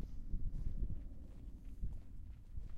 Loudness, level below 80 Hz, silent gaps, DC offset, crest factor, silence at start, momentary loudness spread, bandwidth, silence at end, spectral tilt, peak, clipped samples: -50 LUFS; -44 dBFS; none; under 0.1%; 14 dB; 0 s; 9 LU; 2.5 kHz; 0 s; -9 dB/octave; -28 dBFS; under 0.1%